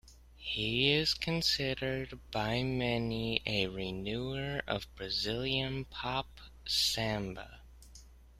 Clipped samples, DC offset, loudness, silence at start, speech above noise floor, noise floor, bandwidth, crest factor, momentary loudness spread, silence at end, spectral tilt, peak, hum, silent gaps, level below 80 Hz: under 0.1%; under 0.1%; -33 LUFS; 0.05 s; 21 dB; -55 dBFS; 15.5 kHz; 24 dB; 10 LU; 0 s; -4 dB/octave; -12 dBFS; none; none; -52 dBFS